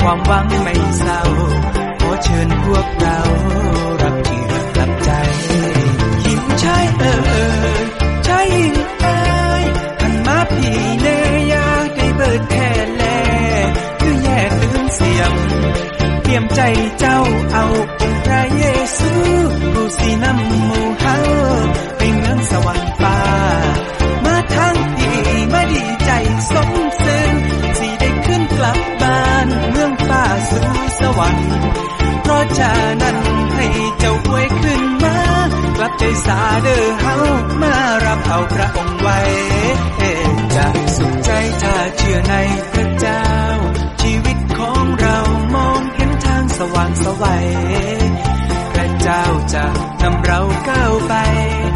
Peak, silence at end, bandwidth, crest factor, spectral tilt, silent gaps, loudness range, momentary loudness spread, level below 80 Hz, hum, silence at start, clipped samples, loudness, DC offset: -2 dBFS; 0 s; 11.5 kHz; 12 dB; -5.5 dB/octave; none; 1 LU; 3 LU; -22 dBFS; none; 0 s; under 0.1%; -15 LUFS; under 0.1%